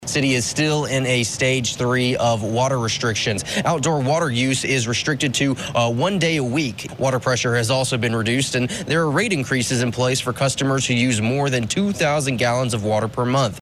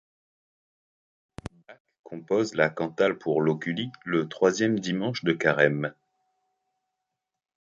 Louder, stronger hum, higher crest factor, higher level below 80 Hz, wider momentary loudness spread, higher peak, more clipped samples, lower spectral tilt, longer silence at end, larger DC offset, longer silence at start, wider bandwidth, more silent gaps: first, -20 LUFS vs -26 LUFS; neither; second, 16 dB vs 24 dB; first, -50 dBFS vs -62 dBFS; second, 3 LU vs 20 LU; about the same, -4 dBFS vs -4 dBFS; neither; about the same, -4.5 dB/octave vs -5.5 dB/octave; second, 0 s vs 1.85 s; neither; second, 0 s vs 1.45 s; first, 14.5 kHz vs 8 kHz; second, none vs 1.80-1.85 s, 1.99-2.04 s